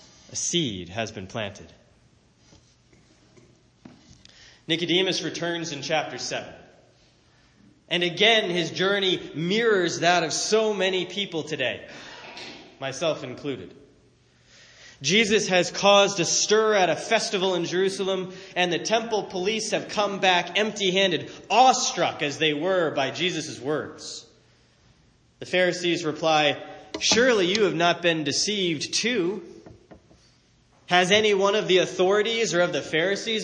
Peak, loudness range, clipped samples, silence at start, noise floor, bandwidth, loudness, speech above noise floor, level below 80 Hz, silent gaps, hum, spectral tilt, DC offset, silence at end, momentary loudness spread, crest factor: -6 dBFS; 9 LU; under 0.1%; 0.3 s; -60 dBFS; 10 kHz; -23 LUFS; 36 dB; -66 dBFS; none; none; -3 dB/octave; under 0.1%; 0 s; 14 LU; 20 dB